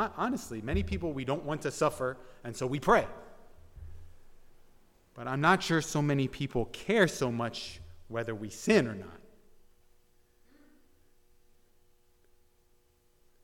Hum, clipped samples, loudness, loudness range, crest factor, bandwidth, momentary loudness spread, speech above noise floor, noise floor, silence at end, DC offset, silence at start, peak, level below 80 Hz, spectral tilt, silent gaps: none; under 0.1%; -31 LUFS; 5 LU; 22 dB; 16.5 kHz; 17 LU; 36 dB; -67 dBFS; 4.2 s; under 0.1%; 0 s; -10 dBFS; -50 dBFS; -5.5 dB/octave; none